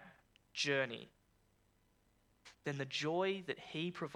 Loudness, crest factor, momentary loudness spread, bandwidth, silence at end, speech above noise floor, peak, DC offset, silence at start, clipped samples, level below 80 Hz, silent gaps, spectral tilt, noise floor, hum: -39 LUFS; 20 dB; 11 LU; 12.5 kHz; 0 s; 35 dB; -22 dBFS; under 0.1%; 0 s; under 0.1%; -78 dBFS; none; -4 dB/octave; -75 dBFS; 50 Hz at -70 dBFS